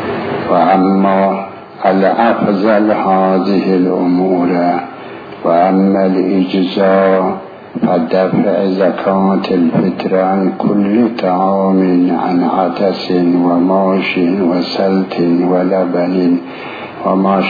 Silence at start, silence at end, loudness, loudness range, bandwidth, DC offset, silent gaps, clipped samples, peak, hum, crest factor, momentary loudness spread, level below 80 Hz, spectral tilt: 0 s; 0 s; -13 LUFS; 1 LU; 5 kHz; under 0.1%; none; under 0.1%; 0 dBFS; none; 12 dB; 7 LU; -56 dBFS; -9 dB/octave